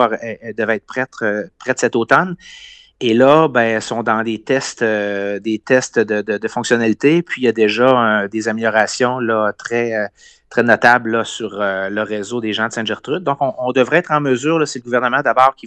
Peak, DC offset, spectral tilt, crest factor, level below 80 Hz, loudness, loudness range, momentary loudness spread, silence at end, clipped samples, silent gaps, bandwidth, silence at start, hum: 0 dBFS; under 0.1%; -4.5 dB/octave; 16 dB; -60 dBFS; -16 LUFS; 2 LU; 10 LU; 0 s; under 0.1%; none; 9.4 kHz; 0 s; none